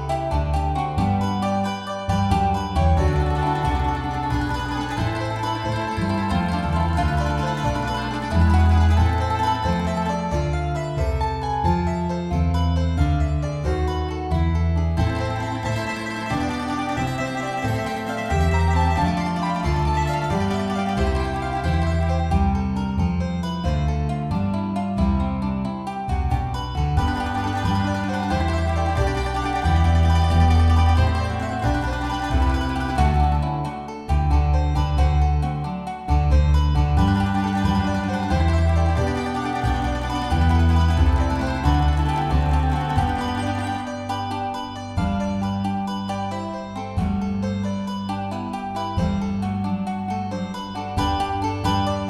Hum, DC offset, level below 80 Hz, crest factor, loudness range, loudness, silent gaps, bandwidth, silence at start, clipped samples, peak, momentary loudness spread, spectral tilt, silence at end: none; under 0.1%; -26 dBFS; 16 dB; 5 LU; -22 LUFS; none; 11.5 kHz; 0 s; under 0.1%; -6 dBFS; 8 LU; -7 dB/octave; 0 s